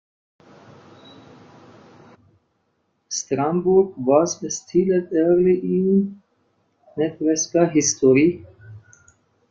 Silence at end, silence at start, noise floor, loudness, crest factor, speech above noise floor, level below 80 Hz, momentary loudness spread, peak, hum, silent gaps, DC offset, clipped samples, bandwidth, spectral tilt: 0.7 s; 3.1 s; -69 dBFS; -19 LUFS; 18 dB; 51 dB; -60 dBFS; 11 LU; -4 dBFS; none; none; under 0.1%; under 0.1%; 7.8 kHz; -5 dB/octave